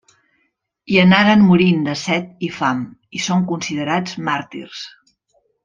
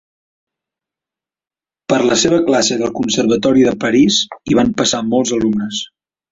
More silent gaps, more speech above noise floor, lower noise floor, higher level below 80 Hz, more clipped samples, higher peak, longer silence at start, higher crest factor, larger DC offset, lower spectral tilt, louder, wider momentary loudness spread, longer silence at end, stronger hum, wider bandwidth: neither; second, 52 dB vs over 76 dB; second, -68 dBFS vs under -90 dBFS; second, -54 dBFS vs -48 dBFS; neither; about the same, -2 dBFS vs -2 dBFS; second, 0.9 s vs 1.9 s; about the same, 16 dB vs 14 dB; neither; first, -5.5 dB/octave vs -4 dB/octave; about the same, -16 LUFS vs -14 LUFS; first, 19 LU vs 7 LU; first, 0.75 s vs 0.45 s; neither; about the same, 7.4 kHz vs 8 kHz